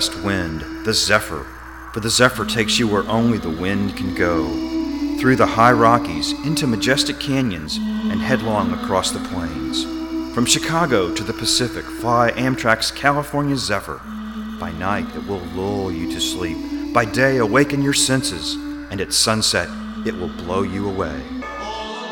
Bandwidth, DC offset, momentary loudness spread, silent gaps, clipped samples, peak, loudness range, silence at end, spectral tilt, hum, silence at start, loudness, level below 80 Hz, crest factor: 19 kHz; under 0.1%; 12 LU; none; under 0.1%; 0 dBFS; 4 LU; 0 s; -4 dB/octave; none; 0 s; -19 LUFS; -40 dBFS; 20 dB